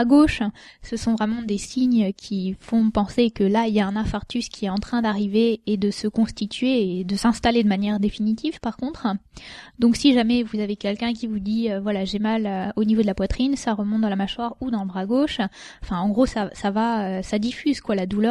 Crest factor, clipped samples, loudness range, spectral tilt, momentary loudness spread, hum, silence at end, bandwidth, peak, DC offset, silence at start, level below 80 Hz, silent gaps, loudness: 18 dB; under 0.1%; 2 LU; -6 dB/octave; 8 LU; none; 0 s; 11 kHz; -4 dBFS; under 0.1%; 0 s; -42 dBFS; none; -23 LUFS